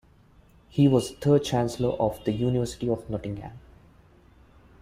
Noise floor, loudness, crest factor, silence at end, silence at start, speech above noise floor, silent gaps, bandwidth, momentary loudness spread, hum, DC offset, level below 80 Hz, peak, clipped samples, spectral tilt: -56 dBFS; -26 LUFS; 18 dB; 1.25 s; 0.75 s; 32 dB; none; 15.5 kHz; 12 LU; none; under 0.1%; -50 dBFS; -8 dBFS; under 0.1%; -7 dB/octave